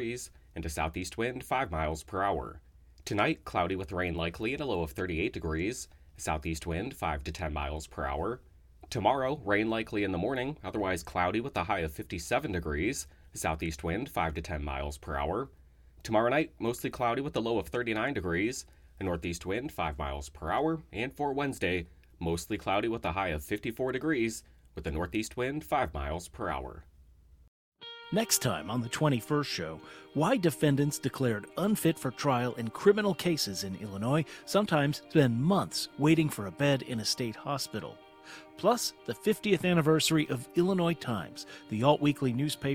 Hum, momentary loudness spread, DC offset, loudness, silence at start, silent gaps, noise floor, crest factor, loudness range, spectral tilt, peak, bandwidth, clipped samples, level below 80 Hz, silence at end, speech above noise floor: none; 11 LU; under 0.1%; -31 LUFS; 0 s; 27.48-27.72 s; -58 dBFS; 22 dB; 6 LU; -5 dB/octave; -10 dBFS; 18 kHz; under 0.1%; -48 dBFS; 0 s; 27 dB